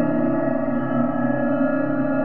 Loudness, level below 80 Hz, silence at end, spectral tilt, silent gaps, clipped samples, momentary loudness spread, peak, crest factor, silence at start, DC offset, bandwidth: -22 LUFS; -50 dBFS; 0 s; -11.5 dB/octave; none; under 0.1%; 2 LU; -6 dBFS; 14 dB; 0 s; 3%; 3.2 kHz